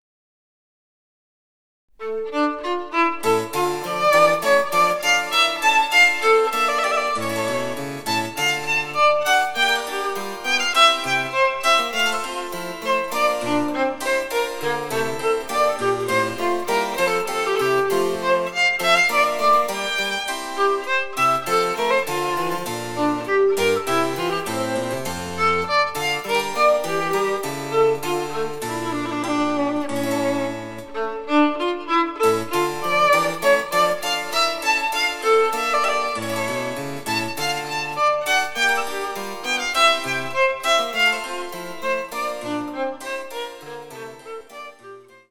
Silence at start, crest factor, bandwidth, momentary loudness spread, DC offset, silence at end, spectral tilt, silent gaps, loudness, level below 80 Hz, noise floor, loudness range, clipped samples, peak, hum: 2 s; 18 dB; 19 kHz; 11 LU; under 0.1%; 0.3 s; -3 dB/octave; none; -20 LUFS; -56 dBFS; -43 dBFS; 5 LU; under 0.1%; -2 dBFS; none